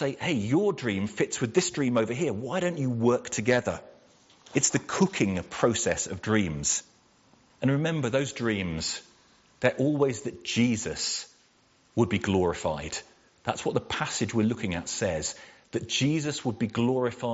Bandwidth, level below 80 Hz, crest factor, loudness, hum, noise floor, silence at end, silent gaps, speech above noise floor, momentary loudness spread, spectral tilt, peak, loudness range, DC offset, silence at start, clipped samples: 8 kHz; -58 dBFS; 22 dB; -28 LUFS; none; -63 dBFS; 0 s; none; 36 dB; 8 LU; -5 dB/octave; -6 dBFS; 3 LU; under 0.1%; 0 s; under 0.1%